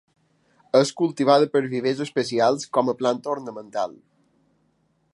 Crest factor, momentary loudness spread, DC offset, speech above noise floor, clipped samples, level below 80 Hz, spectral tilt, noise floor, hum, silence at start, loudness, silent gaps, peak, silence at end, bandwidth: 20 dB; 11 LU; under 0.1%; 45 dB; under 0.1%; -74 dBFS; -5 dB/octave; -67 dBFS; none; 0.75 s; -22 LUFS; none; -2 dBFS; 1.2 s; 11.5 kHz